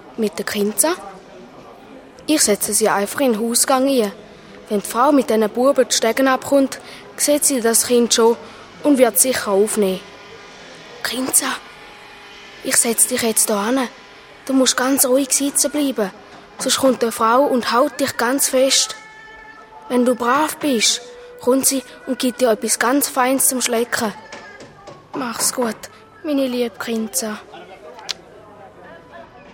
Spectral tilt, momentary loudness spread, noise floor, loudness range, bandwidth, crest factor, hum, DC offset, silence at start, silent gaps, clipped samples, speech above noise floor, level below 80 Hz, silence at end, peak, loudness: -2 dB/octave; 20 LU; -42 dBFS; 7 LU; 19.5 kHz; 18 dB; none; under 0.1%; 0.05 s; none; under 0.1%; 24 dB; -60 dBFS; 0 s; 0 dBFS; -17 LUFS